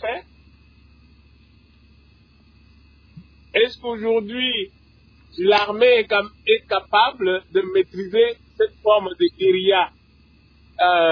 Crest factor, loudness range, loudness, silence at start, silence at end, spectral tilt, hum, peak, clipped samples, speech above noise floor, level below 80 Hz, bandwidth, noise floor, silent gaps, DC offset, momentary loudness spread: 18 dB; 8 LU; -19 LUFS; 0 s; 0 s; -5.5 dB/octave; none; -4 dBFS; under 0.1%; 35 dB; -54 dBFS; 5.4 kHz; -53 dBFS; none; under 0.1%; 8 LU